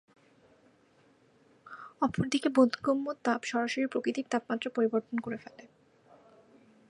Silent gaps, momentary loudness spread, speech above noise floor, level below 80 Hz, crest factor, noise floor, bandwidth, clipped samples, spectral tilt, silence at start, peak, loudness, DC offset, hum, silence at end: none; 16 LU; 35 dB; -68 dBFS; 22 dB; -65 dBFS; 11 kHz; under 0.1%; -5 dB/octave; 1.65 s; -10 dBFS; -31 LUFS; under 0.1%; none; 1.3 s